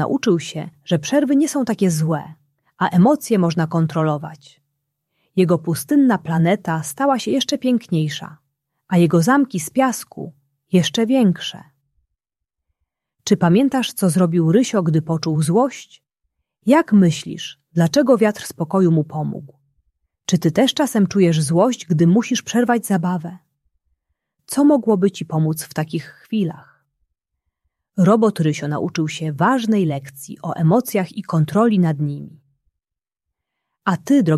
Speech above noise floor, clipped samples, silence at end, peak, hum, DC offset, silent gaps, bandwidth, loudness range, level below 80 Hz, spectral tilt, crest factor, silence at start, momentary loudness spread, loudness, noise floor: 69 dB; under 0.1%; 0 s; -2 dBFS; none; under 0.1%; none; 14.5 kHz; 3 LU; -62 dBFS; -6 dB/octave; 16 dB; 0 s; 12 LU; -18 LUFS; -86 dBFS